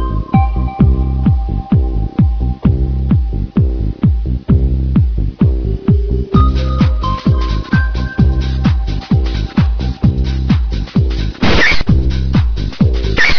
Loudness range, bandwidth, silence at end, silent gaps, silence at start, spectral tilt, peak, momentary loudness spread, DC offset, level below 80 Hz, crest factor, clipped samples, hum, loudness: 1 LU; 5.4 kHz; 0 s; none; 0 s; -7.5 dB/octave; 0 dBFS; 4 LU; under 0.1%; -16 dBFS; 12 dB; under 0.1%; none; -14 LUFS